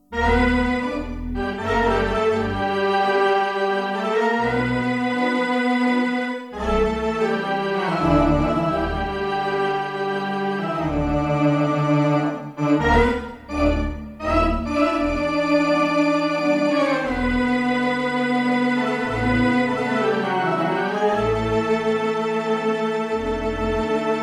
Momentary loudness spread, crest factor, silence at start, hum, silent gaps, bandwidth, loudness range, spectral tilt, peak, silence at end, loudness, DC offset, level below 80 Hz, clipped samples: 6 LU; 16 dB; 0.1 s; none; none; 11.5 kHz; 2 LU; -6.5 dB/octave; -4 dBFS; 0 s; -21 LUFS; under 0.1%; -34 dBFS; under 0.1%